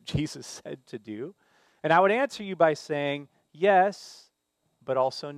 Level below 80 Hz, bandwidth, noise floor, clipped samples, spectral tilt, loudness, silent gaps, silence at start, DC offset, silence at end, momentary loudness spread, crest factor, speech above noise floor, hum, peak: -60 dBFS; 13.5 kHz; -76 dBFS; under 0.1%; -5 dB/octave; -26 LUFS; none; 0.05 s; under 0.1%; 0 s; 19 LU; 20 dB; 50 dB; none; -8 dBFS